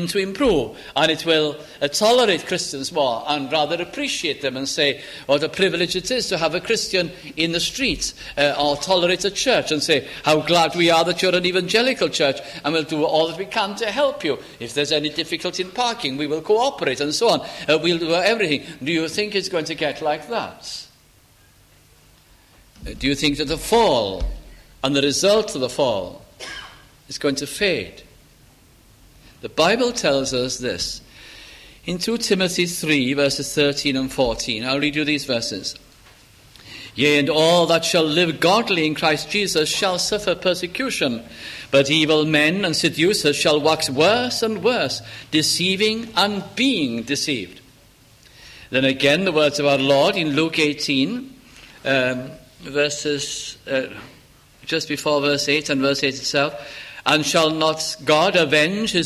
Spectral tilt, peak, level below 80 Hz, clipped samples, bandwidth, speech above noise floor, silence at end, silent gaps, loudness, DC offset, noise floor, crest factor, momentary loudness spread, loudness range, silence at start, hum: -3.5 dB/octave; -2 dBFS; -46 dBFS; under 0.1%; 15.5 kHz; 33 dB; 0 s; none; -20 LUFS; under 0.1%; -53 dBFS; 20 dB; 11 LU; 6 LU; 0 s; none